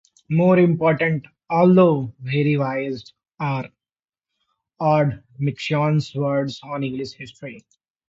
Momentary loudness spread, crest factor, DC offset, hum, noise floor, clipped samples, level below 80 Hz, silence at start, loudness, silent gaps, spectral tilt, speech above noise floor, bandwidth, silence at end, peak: 16 LU; 18 dB; under 0.1%; none; under -90 dBFS; under 0.1%; -60 dBFS; 0.3 s; -20 LUFS; none; -8 dB/octave; over 70 dB; 7.8 kHz; 0.5 s; -2 dBFS